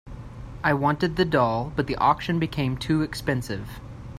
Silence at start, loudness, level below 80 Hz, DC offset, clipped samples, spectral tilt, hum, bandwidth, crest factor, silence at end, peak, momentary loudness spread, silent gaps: 0.05 s; -24 LUFS; -44 dBFS; under 0.1%; under 0.1%; -6.5 dB/octave; none; 15.5 kHz; 20 dB; 0 s; -4 dBFS; 18 LU; none